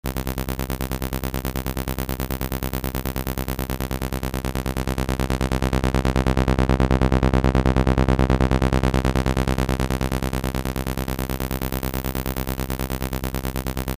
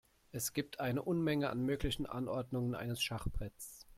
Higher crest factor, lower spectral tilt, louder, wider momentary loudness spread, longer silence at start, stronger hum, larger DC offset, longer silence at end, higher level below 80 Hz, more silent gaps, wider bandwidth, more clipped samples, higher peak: about the same, 18 dB vs 16 dB; about the same, -6 dB/octave vs -5 dB/octave; first, -23 LUFS vs -38 LUFS; about the same, 8 LU vs 10 LU; second, 0.05 s vs 0.35 s; neither; neither; about the same, 0.05 s vs 0.05 s; first, -26 dBFS vs -50 dBFS; neither; about the same, 16 kHz vs 16.5 kHz; neither; first, -4 dBFS vs -22 dBFS